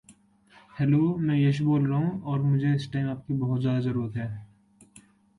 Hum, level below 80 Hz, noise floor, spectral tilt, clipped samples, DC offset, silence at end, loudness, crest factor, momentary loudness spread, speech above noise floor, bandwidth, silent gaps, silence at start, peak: none; -60 dBFS; -58 dBFS; -9 dB/octave; under 0.1%; under 0.1%; 0.95 s; -26 LUFS; 14 dB; 9 LU; 33 dB; 10.5 kHz; none; 0.1 s; -12 dBFS